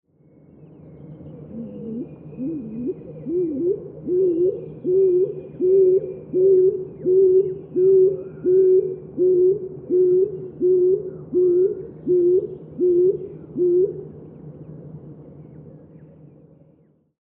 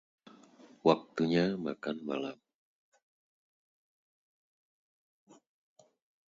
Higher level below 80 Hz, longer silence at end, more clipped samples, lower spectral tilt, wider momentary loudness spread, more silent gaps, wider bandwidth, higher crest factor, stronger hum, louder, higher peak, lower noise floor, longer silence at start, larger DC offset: first, -60 dBFS vs -76 dBFS; second, 1.45 s vs 3.95 s; neither; first, -13.5 dB/octave vs -7 dB/octave; first, 20 LU vs 9 LU; neither; second, 1.5 kHz vs 7.6 kHz; second, 12 dB vs 28 dB; neither; first, -20 LUFS vs -32 LUFS; about the same, -8 dBFS vs -10 dBFS; about the same, -58 dBFS vs -59 dBFS; about the same, 0.9 s vs 0.85 s; neither